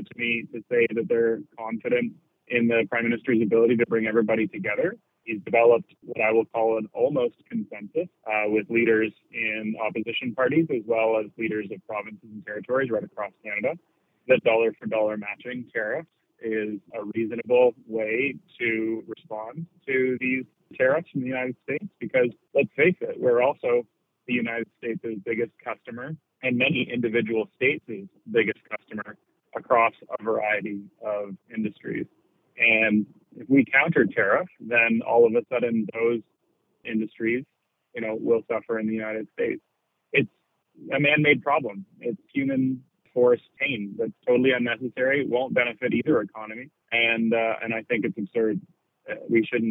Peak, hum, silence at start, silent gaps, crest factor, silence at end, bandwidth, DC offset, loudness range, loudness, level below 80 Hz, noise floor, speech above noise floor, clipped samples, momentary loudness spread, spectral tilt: -6 dBFS; none; 0 s; none; 20 dB; 0 s; 3.9 kHz; under 0.1%; 5 LU; -25 LUFS; -74 dBFS; -71 dBFS; 47 dB; under 0.1%; 14 LU; -9 dB/octave